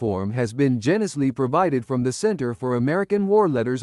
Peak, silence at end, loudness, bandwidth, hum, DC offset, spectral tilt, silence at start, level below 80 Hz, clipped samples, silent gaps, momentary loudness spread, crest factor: -6 dBFS; 0 s; -22 LUFS; 12 kHz; none; under 0.1%; -7 dB/octave; 0 s; -60 dBFS; under 0.1%; none; 6 LU; 14 dB